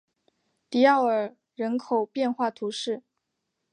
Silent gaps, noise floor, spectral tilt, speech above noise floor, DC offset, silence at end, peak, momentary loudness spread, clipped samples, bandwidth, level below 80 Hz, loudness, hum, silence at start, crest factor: none; -81 dBFS; -4.5 dB/octave; 56 dB; under 0.1%; 0.75 s; -6 dBFS; 13 LU; under 0.1%; 10 kHz; -84 dBFS; -26 LUFS; none; 0.7 s; 20 dB